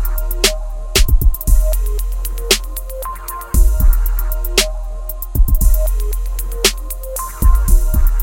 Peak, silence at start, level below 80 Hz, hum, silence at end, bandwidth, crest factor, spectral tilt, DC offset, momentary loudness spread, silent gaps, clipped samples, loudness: 0 dBFS; 0 s; -14 dBFS; none; 0 s; 17.5 kHz; 14 dB; -3 dB/octave; under 0.1%; 10 LU; none; under 0.1%; -18 LUFS